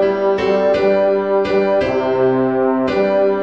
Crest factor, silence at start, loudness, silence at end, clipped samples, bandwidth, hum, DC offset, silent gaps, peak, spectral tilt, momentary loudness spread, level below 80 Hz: 10 dB; 0 s; -15 LUFS; 0 s; under 0.1%; 6.8 kHz; none; 0.3%; none; -4 dBFS; -7.5 dB/octave; 2 LU; -48 dBFS